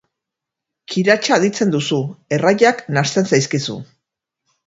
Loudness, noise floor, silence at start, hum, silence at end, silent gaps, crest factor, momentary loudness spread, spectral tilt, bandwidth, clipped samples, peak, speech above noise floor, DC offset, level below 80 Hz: -17 LUFS; -83 dBFS; 0.9 s; none; 0.8 s; none; 18 dB; 9 LU; -4.5 dB/octave; 8 kHz; under 0.1%; 0 dBFS; 67 dB; under 0.1%; -60 dBFS